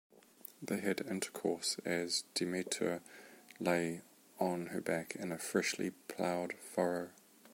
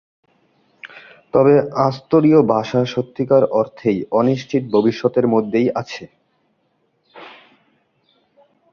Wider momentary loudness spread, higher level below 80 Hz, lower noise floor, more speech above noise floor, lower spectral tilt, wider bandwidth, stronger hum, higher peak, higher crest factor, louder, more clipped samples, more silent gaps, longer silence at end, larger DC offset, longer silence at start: about the same, 14 LU vs 12 LU; second, -80 dBFS vs -58 dBFS; second, -57 dBFS vs -65 dBFS; second, 20 dB vs 49 dB; second, -3.5 dB/octave vs -8 dB/octave; first, 16.5 kHz vs 7 kHz; neither; second, -18 dBFS vs 0 dBFS; about the same, 22 dB vs 18 dB; second, -38 LUFS vs -17 LUFS; neither; neither; second, 0.05 s vs 1.45 s; neither; second, 0.15 s vs 0.85 s